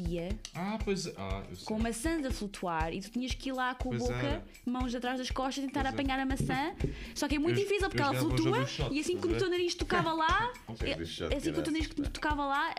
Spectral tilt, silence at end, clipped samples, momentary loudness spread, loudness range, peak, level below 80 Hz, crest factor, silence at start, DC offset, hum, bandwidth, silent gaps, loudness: -5 dB/octave; 0 s; under 0.1%; 8 LU; 4 LU; -16 dBFS; -44 dBFS; 18 dB; 0 s; under 0.1%; none; 15.5 kHz; none; -33 LUFS